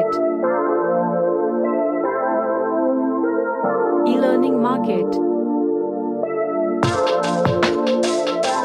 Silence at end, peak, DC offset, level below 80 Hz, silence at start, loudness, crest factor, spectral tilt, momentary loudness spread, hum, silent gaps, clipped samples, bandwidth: 0 s; -2 dBFS; under 0.1%; -56 dBFS; 0 s; -19 LUFS; 16 dB; -6 dB/octave; 3 LU; none; none; under 0.1%; 11 kHz